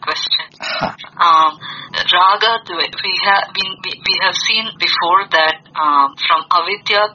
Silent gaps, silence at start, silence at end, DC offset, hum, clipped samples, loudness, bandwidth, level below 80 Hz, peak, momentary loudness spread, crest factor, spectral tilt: none; 0 s; 0 s; under 0.1%; none; under 0.1%; -14 LUFS; 7.2 kHz; -58 dBFS; 0 dBFS; 9 LU; 16 dB; 2 dB/octave